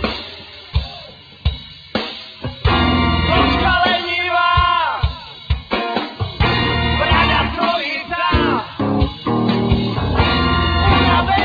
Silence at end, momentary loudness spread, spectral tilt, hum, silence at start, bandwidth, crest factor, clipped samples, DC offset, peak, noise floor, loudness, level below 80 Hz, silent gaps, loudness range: 0 s; 12 LU; -7.5 dB/octave; none; 0 s; 5 kHz; 16 dB; under 0.1%; under 0.1%; -2 dBFS; -38 dBFS; -17 LUFS; -26 dBFS; none; 2 LU